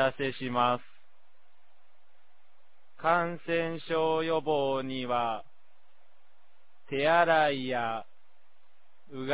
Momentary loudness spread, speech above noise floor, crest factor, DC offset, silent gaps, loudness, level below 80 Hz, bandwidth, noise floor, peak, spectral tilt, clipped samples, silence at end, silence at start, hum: 11 LU; 42 dB; 20 dB; 0.8%; none; -29 LUFS; -72 dBFS; 4 kHz; -70 dBFS; -10 dBFS; -3 dB/octave; under 0.1%; 0 s; 0 s; none